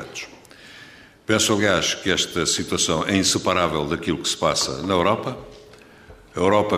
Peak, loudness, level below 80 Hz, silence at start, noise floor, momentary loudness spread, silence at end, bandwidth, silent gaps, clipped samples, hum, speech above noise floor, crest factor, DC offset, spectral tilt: -4 dBFS; -21 LUFS; -48 dBFS; 0 s; -47 dBFS; 16 LU; 0 s; 15.5 kHz; none; under 0.1%; none; 26 dB; 18 dB; under 0.1%; -3 dB/octave